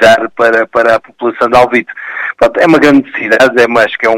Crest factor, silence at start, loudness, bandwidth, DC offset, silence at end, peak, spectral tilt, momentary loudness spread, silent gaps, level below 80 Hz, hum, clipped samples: 8 dB; 0 s; -9 LUFS; 16 kHz; under 0.1%; 0 s; 0 dBFS; -5 dB/octave; 8 LU; none; -44 dBFS; none; 2%